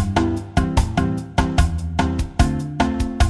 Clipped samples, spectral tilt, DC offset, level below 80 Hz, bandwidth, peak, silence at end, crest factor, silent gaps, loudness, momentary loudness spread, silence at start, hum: under 0.1%; -6 dB/octave; under 0.1%; -24 dBFS; 12.5 kHz; -2 dBFS; 0 s; 16 dB; none; -21 LUFS; 2 LU; 0 s; none